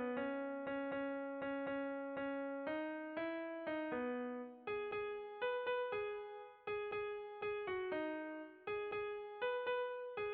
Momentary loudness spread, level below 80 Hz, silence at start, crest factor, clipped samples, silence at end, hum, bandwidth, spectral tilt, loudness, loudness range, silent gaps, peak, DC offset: 6 LU; -78 dBFS; 0 s; 12 dB; under 0.1%; 0 s; none; 4.9 kHz; -2.5 dB/octave; -43 LUFS; 1 LU; none; -30 dBFS; under 0.1%